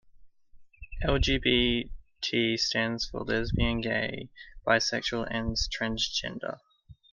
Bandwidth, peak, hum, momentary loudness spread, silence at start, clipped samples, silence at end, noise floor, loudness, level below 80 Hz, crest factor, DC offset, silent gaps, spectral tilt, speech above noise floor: 10 kHz; -10 dBFS; none; 13 LU; 0.15 s; under 0.1%; 0.2 s; -54 dBFS; -28 LUFS; -40 dBFS; 20 dB; under 0.1%; none; -4 dB/octave; 25 dB